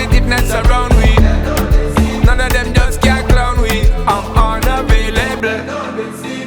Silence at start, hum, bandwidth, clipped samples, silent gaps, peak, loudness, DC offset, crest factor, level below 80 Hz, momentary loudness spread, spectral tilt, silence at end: 0 s; none; over 20 kHz; under 0.1%; none; 0 dBFS; -14 LUFS; under 0.1%; 12 dB; -14 dBFS; 6 LU; -5.5 dB/octave; 0 s